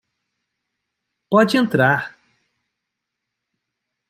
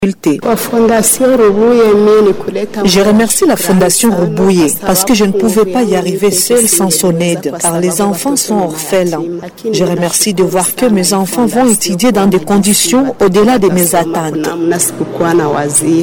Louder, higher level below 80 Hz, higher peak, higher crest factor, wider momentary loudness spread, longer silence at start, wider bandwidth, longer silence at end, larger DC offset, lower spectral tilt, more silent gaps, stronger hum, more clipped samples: second, -17 LUFS vs -10 LUFS; second, -64 dBFS vs -40 dBFS; about the same, -2 dBFS vs 0 dBFS; first, 20 dB vs 10 dB; about the same, 7 LU vs 6 LU; first, 1.3 s vs 0 s; second, 16 kHz vs 19 kHz; first, 2 s vs 0 s; neither; first, -6 dB/octave vs -4 dB/octave; neither; neither; neither